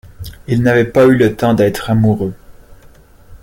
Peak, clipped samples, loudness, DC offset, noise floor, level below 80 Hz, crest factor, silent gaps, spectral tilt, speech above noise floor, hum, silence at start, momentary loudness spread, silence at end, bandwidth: 0 dBFS; under 0.1%; -13 LUFS; under 0.1%; -42 dBFS; -38 dBFS; 14 dB; none; -7.5 dB/octave; 31 dB; none; 0.05 s; 13 LU; 0.05 s; 17 kHz